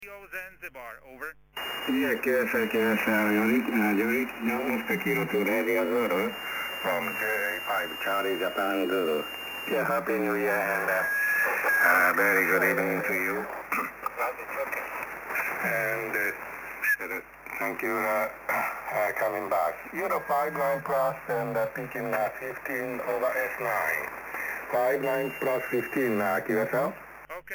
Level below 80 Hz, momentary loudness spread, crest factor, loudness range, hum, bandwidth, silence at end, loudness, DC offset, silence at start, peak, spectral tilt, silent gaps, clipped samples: -64 dBFS; 10 LU; 18 dB; 6 LU; none; 17.5 kHz; 0 s; -27 LUFS; under 0.1%; 0 s; -12 dBFS; -4.5 dB/octave; none; under 0.1%